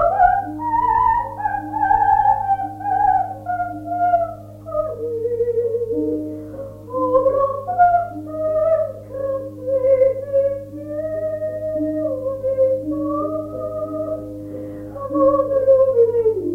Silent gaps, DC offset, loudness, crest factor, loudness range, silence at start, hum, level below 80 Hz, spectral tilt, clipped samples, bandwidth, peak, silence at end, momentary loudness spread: none; under 0.1%; -20 LUFS; 16 dB; 4 LU; 0 s; 50 Hz at -55 dBFS; -44 dBFS; -9 dB/octave; under 0.1%; 3.4 kHz; -2 dBFS; 0 s; 12 LU